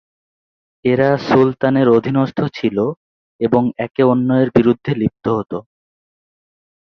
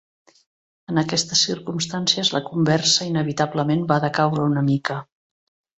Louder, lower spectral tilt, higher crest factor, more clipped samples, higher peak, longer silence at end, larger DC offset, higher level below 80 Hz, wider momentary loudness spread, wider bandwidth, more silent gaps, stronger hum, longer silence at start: first, -16 LUFS vs -20 LUFS; first, -9 dB/octave vs -4 dB/octave; about the same, 16 dB vs 20 dB; neither; about the same, -2 dBFS vs -2 dBFS; first, 1.35 s vs 0.75 s; neither; first, -50 dBFS vs -60 dBFS; about the same, 9 LU vs 7 LU; second, 6.4 kHz vs 8.2 kHz; first, 2.97-3.39 s vs none; neither; about the same, 0.85 s vs 0.9 s